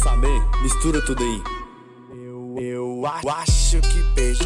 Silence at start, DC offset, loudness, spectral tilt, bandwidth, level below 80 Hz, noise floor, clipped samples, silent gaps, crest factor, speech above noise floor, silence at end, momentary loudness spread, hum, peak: 0 s; under 0.1%; -22 LUFS; -4.5 dB/octave; 11 kHz; -20 dBFS; -42 dBFS; under 0.1%; none; 12 dB; 24 dB; 0 s; 16 LU; none; -8 dBFS